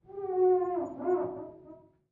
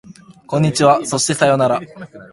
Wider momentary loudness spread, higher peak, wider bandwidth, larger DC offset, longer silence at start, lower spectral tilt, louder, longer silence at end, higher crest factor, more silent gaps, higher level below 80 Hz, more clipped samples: about the same, 15 LU vs 13 LU; second, -18 dBFS vs 0 dBFS; second, 2.5 kHz vs 11.5 kHz; neither; about the same, 0.1 s vs 0.1 s; first, -10 dB/octave vs -4.5 dB/octave; second, -30 LUFS vs -15 LUFS; first, 0.35 s vs 0.05 s; about the same, 14 dB vs 16 dB; neither; second, -70 dBFS vs -54 dBFS; neither